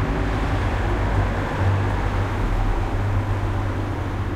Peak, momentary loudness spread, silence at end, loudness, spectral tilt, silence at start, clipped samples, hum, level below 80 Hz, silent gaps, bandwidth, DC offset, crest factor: -8 dBFS; 3 LU; 0 s; -24 LUFS; -7.5 dB/octave; 0 s; under 0.1%; none; -26 dBFS; none; 10.5 kHz; under 0.1%; 12 dB